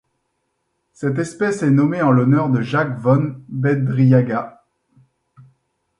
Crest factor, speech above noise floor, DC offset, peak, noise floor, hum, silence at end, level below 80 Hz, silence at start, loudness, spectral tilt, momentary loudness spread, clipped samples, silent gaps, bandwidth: 18 dB; 55 dB; under 0.1%; -2 dBFS; -71 dBFS; none; 1.5 s; -60 dBFS; 1 s; -18 LUFS; -8.5 dB/octave; 10 LU; under 0.1%; none; 10.5 kHz